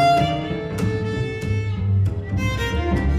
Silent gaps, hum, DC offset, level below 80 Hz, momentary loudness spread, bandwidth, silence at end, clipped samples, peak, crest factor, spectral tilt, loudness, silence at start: none; none; under 0.1%; -30 dBFS; 5 LU; 14 kHz; 0 s; under 0.1%; -6 dBFS; 14 dB; -7 dB/octave; -22 LUFS; 0 s